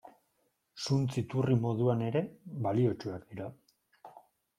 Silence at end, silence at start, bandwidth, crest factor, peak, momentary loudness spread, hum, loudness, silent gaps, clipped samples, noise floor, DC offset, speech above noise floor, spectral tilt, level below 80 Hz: 0.4 s; 0.05 s; 11 kHz; 18 dB; -14 dBFS; 13 LU; none; -32 LUFS; none; under 0.1%; -77 dBFS; under 0.1%; 46 dB; -7.5 dB/octave; -68 dBFS